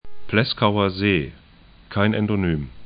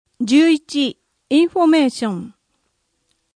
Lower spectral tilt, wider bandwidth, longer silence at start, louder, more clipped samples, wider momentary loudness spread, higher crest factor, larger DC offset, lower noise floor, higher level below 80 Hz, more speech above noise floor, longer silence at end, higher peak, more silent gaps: first, -11 dB/octave vs -4.5 dB/octave; second, 5.2 kHz vs 10.5 kHz; second, 0.05 s vs 0.2 s; second, -21 LUFS vs -16 LUFS; neither; second, 5 LU vs 11 LU; about the same, 20 dB vs 16 dB; neither; second, -48 dBFS vs -69 dBFS; first, -44 dBFS vs -66 dBFS; second, 27 dB vs 53 dB; second, 0 s vs 1.05 s; about the same, -2 dBFS vs -4 dBFS; neither